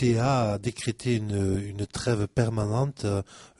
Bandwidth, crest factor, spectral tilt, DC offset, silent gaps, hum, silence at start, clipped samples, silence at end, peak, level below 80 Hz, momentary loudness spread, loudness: 11.5 kHz; 16 dB; -6.5 dB/octave; under 0.1%; none; none; 0 s; under 0.1%; 0.15 s; -10 dBFS; -50 dBFS; 7 LU; -27 LUFS